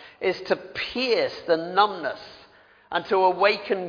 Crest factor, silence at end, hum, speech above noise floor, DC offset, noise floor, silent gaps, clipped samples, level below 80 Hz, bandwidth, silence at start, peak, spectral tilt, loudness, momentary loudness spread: 20 dB; 0 s; none; 30 dB; under 0.1%; -54 dBFS; none; under 0.1%; -64 dBFS; 5.4 kHz; 0 s; -4 dBFS; -5 dB/octave; -24 LUFS; 11 LU